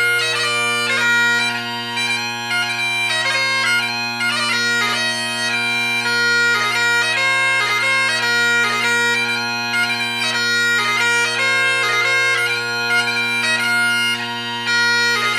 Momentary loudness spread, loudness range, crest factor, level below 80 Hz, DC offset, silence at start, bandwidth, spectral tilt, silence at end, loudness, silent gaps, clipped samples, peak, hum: 4 LU; 2 LU; 14 dB; -70 dBFS; under 0.1%; 0 s; 15.5 kHz; -1 dB/octave; 0 s; -16 LUFS; none; under 0.1%; -4 dBFS; none